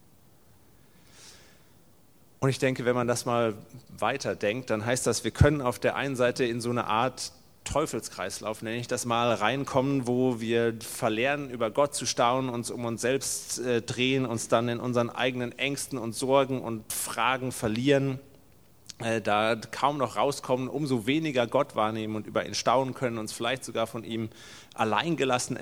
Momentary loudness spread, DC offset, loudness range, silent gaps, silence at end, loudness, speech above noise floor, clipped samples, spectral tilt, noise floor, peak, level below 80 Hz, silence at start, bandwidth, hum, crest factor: 8 LU; 0.1%; 3 LU; none; 0 s; -28 LUFS; 33 dB; under 0.1%; -4.5 dB/octave; -61 dBFS; -6 dBFS; -52 dBFS; 1.2 s; over 20 kHz; none; 22 dB